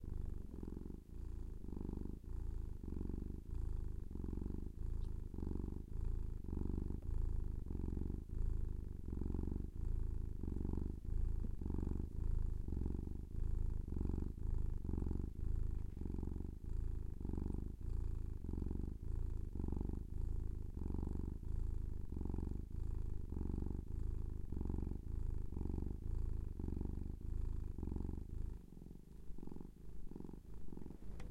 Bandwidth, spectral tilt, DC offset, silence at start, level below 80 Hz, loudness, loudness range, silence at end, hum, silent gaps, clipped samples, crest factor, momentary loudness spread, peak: 2.6 kHz; -10 dB/octave; under 0.1%; 0 s; -42 dBFS; -47 LUFS; 4 LU; 0 s; none; none; under 0.1%; 16 dB; 7 LU; -26 dBFS